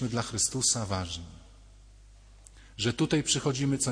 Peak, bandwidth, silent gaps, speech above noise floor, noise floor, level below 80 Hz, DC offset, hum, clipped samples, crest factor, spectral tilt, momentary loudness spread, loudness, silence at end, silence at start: -12 dBFS; 10.5 kHz; none; 24 dB; -53 dBFS; -52 dBFS; under 0.1%; none; under 0.1%; 18 dB; -3.5 dB/octave; 14 LU; -28 LUFS; 0 s; 0 s